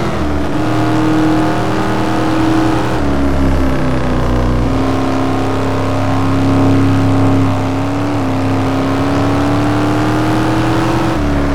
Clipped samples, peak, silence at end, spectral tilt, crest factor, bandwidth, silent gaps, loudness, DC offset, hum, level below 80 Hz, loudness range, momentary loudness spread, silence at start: under 0.1%; -2 dBFS; 0 s; -7 dB/octave; 10 dB; 16 kHz; none; -14 LUFS; 10%; none; -24 dBFS; 1 LU; 4 LU; 0 s